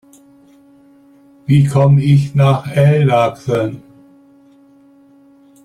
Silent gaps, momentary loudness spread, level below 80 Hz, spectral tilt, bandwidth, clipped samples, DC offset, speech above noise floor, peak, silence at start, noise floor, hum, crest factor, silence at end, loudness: none; 10 LU; -50 dBFS; -8 dB/octave; 10.5 kHz; under 0.1%; under 0.1%; 35 dB; -2 dBFS; 1.5 s; -47 dBFS; none; 14 dB; 1.85 s; -13 LUFS